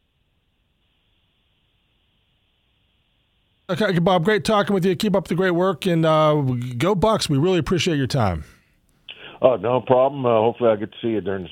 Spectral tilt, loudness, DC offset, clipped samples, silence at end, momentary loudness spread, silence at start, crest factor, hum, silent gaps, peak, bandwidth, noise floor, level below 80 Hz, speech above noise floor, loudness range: -6 dB/octave; -20 LUFS; under 0.1%; under 0.1%; 0 s; 7 LU; 3.7 s; 20 dB; none; none; 0 dBFS; 16.5 kHz; -67 dBFS; -48 dBFS; 48 dB; 5 LU